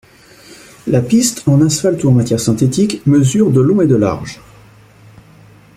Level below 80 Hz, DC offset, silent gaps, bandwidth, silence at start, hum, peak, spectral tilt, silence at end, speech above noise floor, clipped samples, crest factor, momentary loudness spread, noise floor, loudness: -46 dBFS; under 0.1%; none; 15.5 kHz; 0.5 s; none; 0 dBFS; -6 dB/octave; 1.4 s; 30 dB; under 0.1%; 14 dB; 6 LU; -42 dBFS; -13 LUFS